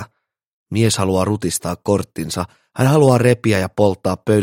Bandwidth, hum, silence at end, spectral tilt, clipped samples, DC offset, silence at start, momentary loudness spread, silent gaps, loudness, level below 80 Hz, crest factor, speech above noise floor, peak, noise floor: 16.5 kHz; none; 0 s; -5.5 dB/octave; under 0.1%; under 0.1%; 0 s; 12 LU; 0.47-0.66 s; -17 LUFS; -48 dBFS; 16 dB; 37 dB; 0 dBFS; -53 dBFS